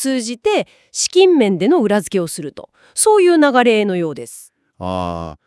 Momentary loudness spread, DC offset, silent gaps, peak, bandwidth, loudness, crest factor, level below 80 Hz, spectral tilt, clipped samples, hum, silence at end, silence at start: 15 LU; under 0.1%; none; 0 dBFS; 12 kHz; -15 LUFS; 16 dB; -56 dBFS; -4 dB/octave; under 0.1%; none; 0.15 s; 0 s